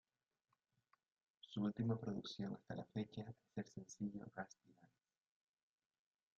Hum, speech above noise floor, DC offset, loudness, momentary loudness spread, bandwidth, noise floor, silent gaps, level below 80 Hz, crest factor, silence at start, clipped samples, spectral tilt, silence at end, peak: none; 36 dB; under 0.1%; -48 LUFS; 12 LU; 7.4 kHz; -83 dBFS; none; -82 dBFS; 20 dB; 1.45 s; under 0.1%; -6.5 dB/octave; 1.55 s; -30 dBFS